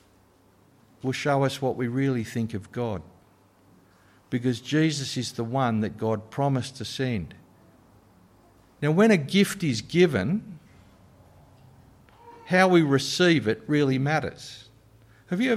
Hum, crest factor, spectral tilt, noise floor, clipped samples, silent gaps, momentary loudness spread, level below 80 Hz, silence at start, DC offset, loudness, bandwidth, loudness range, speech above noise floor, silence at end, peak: none; 20 dB; -5.5 dB/octave; -59 dBFS; under 0.1%; none; 13 LU; -60 dBFS; 1.05 s; under 0.1%; -25 LUFS; 15.5 kHz; 6 LU; 35 dB; 0 s; -8 dBFS